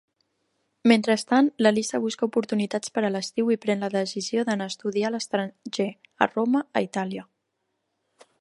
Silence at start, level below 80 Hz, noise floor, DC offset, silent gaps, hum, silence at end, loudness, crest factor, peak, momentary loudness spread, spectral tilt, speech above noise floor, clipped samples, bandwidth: 0.85 s; -74 dBFS; -77 dBFS; under 0.1%; none; none; 1.2 s; -25 LUFS; 24 dB; -2 dBFS; 9 LU; -4.5 dB/octave; 53 dB; under 0.1%; 11.5 kHz